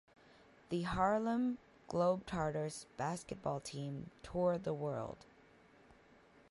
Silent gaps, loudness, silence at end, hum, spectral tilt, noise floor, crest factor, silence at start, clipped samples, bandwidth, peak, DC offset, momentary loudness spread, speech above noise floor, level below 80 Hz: none; -39 LUFS; 0.55 s; none; -6.5 dB/octave; -65 dBFS; 20 dB; 0.7 s; under 0.1%; 11.5 kHz; -20 dBFS; under 0.1%; 11 LU; 27 dB; -62 dBFS